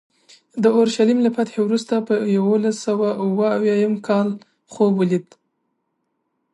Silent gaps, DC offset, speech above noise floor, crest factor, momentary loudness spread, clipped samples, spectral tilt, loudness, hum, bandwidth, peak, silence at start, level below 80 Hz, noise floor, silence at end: none; under 0.1%; 54 dB; 16 dB; 5 LU; under 0.1%; -6.5 dB/octave; -19 LUFS; none; 11 kHz; -4 dBFS; 0.55 s; -70 dBFS; -73 dBFS; 1.3 s